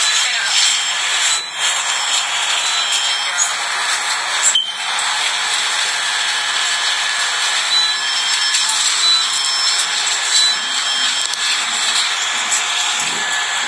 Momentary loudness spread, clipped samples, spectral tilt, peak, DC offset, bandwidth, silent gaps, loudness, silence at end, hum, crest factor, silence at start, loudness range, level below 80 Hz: 4 LU; under 0.1%; 3.5 dB/octave; 0 dBFS; under 0.1%; 11 kHz; none; -14 LUFS; 0 s; none; 16 dB; 0 s; 2 LU; -84 dBFS